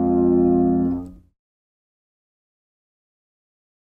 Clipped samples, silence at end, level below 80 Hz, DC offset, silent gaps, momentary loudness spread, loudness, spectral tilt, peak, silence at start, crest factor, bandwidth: under 0.1%; 2.8 s; -48 dBFS; under 0.1%; none; 8 LU; -18 LUFS; -13 dB/octave; -8 dBFS; 0 s; 16 dB; 1.9 kHz